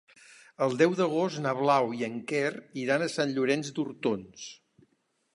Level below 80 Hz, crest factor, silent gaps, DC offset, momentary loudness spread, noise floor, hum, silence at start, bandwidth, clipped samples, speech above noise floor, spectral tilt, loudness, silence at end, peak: -76 dBFS; 20 dB; none; under 0.1%; 11 LU; -73 dBFS; none; 0.6 s; 11.5 kHz; under 0.1%; 45 dB; -5 dB/octave; -28 LUFS; 0.8 s; -10 dBFS